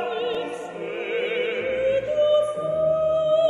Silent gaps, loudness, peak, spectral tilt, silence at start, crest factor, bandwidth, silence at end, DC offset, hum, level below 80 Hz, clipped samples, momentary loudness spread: none; -24 LUFS; -10 dBFS; -5 dB/octave; 0 s; 12 dB; 10.5 kHz; 0 s; under 0.1%; none; -56 dBFS; under 0.1%; 10 LU